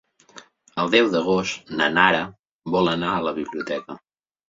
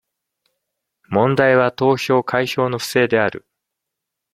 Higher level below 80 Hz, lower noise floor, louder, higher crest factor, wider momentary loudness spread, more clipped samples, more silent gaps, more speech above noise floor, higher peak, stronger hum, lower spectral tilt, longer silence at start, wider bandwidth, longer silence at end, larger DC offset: about the same, -58 dBFS vs -60 dBFS; second, -48 dBFS vs -81 dBFS; second, -21 LUFS vs -17 LUFS; about the same, 22 dB vs 18 dB; first, 17 LU vs 7 LU; neither; first, 2.39-2.43 s, 2.51-2.59 s vs none; second, 27 dB vs 64 dB; about the same, -2 dBFS vs -2 dBFS; neither; about the same, -4.5 dB/octave vs -5.5 dB/octave; second, 0.35 s vs 1.1 s; second, 7.8 kHz vs 16 kHz; second, 0.5 s vs 0.95 s; neither